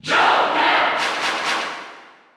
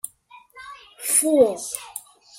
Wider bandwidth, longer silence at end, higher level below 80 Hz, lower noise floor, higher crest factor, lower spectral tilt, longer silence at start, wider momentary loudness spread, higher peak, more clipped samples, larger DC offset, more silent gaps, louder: about the same, 15.5 kHz vs 16.5 kHz; about the same, 0.3 s vs 0.4 s; about the same, -62 dBFS vs -64 dBFS; second, -43 dBFS vs -51 dBFS; about the same, 16 dB vs 20 dB; about the same, -1.5 dB/octave vs -2 dB/octave; about the same, 0.05 s vs 0.05 s; second, 14 LU vs 24 LU; about the same, -4 dBFS vs -4 dBFS; neither; neither; neither; about the same, -18 LUFS vs -20 LUFS